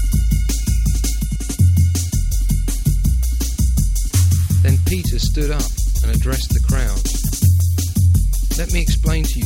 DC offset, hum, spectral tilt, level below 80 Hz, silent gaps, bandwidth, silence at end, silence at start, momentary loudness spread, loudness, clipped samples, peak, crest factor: under 0.1%; none; -5 dB/octave; -18 dBFS; none; 17 kHz; 0 s; 0 s; 5 LU; -18 LUFS; under 0.1%; -4 dBFS; 12 dB